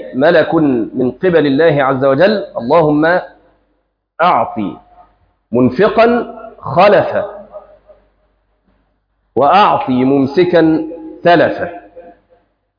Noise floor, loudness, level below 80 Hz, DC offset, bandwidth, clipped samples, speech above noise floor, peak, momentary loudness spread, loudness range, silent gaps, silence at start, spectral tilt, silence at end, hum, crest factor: -64 dBFS; -12 LUFS; -50 dBFS; under 0.1%; 5.2 kHz; under 0.1%; 53 dB; 0 dBFS; 13 LU; 3 LU; none; 0 s; -8.5 dB/octave; 0.7 s; none; 14 dB